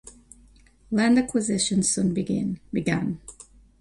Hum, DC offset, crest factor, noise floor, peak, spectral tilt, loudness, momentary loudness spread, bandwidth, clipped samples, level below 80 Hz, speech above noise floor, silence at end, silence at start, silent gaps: none; under 0.1%; 16 dB; -54 dBFS; -8 dBFS; -4.5 dB/octave; -24 LUFS; 9 LU; 11.5 kHz; under 0.1%; -52 dBFS; 31 dB; 0.5 s; 0.05 s; none